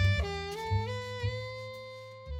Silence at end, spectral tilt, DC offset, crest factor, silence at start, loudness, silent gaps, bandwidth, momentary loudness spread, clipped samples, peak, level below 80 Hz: 0 s; -5.5 dB/octave; under 0.1%; 16 dB; 0 s; -35 LUFS; none; 11 kHz; 12 LU; under 0.1%; -16 dBFS; -44 dBFS